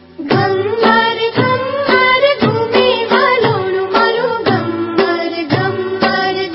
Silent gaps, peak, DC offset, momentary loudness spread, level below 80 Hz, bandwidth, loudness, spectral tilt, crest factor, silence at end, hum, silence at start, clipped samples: none; 0 dBFS; under 0.1%; 5 LU; -50 dBFS; 5.8 kHz; -13 LUFS; -8.5 dB/octave; 14 dB; 0 s; none; 0.2 s; under 0.1%